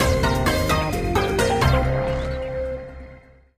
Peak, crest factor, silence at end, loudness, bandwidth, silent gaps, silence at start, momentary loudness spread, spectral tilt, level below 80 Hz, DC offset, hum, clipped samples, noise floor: -6 dBFS; 16 dB; 0.4 s; -22 LUFS; 15.5 kHz; none; 0 s; 11 LU; -5.5 dB/octave; -28 dBFS; under 0.1%; none; under 0.1%; -46 dBFS